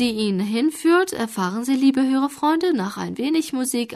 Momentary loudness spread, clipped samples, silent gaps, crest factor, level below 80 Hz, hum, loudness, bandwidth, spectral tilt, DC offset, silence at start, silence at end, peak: 6 LU; under 0.1%; none; 12 dB; -62 dBFS; none; -21 LUFS; 13.5 kHz; -4.5 dB/octave; under 0.1%; 0 s; 0 s; -8 dBFS